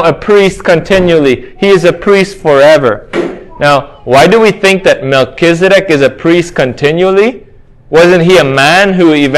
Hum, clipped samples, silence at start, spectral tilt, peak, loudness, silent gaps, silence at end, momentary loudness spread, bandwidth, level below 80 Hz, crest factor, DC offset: none; 4%; 0 s; -5.5 dB/octave; 0 dBFS; -7 LUFS; none; 0 s; 7 LU; 16 kHz; -36 dBFS; 8 dB; under 0.1%